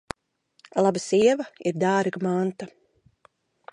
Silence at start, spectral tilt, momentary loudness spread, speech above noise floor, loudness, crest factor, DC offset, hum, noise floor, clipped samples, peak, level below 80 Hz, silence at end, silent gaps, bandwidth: 0.75 s; -5.5 dB/octave; 20 LU; 44 dB; -24 LUFS; 18 dB; under 0.1%; none; -67 dBFS; under 0.1%; -8 dBFS; -64 dBFS; 1.05 s; none; 11 kHz